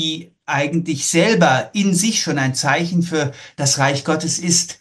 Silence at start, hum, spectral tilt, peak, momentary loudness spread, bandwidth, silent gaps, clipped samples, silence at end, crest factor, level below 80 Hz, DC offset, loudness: 0 s; none; -3.5 dB/octave; -2 dBFS; 7 LU; 12.5 kHz; none; under 0.1%; 0.05 s; 16 dB; -60 dBFS; under 0.1%; -17 LUFS